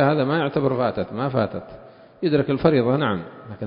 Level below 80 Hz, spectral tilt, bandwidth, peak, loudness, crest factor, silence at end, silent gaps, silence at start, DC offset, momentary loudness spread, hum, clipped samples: -52 dBFS; -12 dB/octave; 5.4 kHz; -2 dBFS; -22 LUFS; 20 dB; 0 s; none; 0 s; under 0.1%; 11 LU; none; under 0.1%